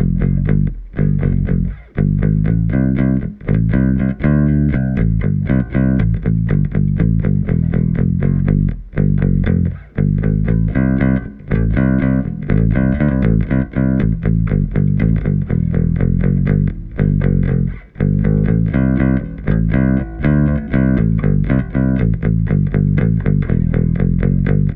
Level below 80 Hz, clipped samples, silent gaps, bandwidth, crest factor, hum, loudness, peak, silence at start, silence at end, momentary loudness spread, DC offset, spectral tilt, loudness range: -22 dBFS; under 0.1%; none; 3.9 kHz; 14 dB; none; -16 LUFS; -2 dBFS; 0 s; 0 s; 3 LU; under 0.1%; -13 dB/octave; 1 LU